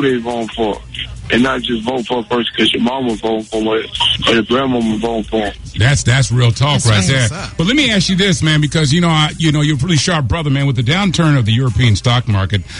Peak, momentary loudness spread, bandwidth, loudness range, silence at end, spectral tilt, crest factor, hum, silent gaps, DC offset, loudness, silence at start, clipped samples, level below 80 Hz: -2 dBFS; 7 LU; 11 kHz; 4 LU; 0 s; -5 dB/octave; 10 dB; none; none; under 0.1%; -14 LUFS; 0 s; under 0.1%; -34 dBFS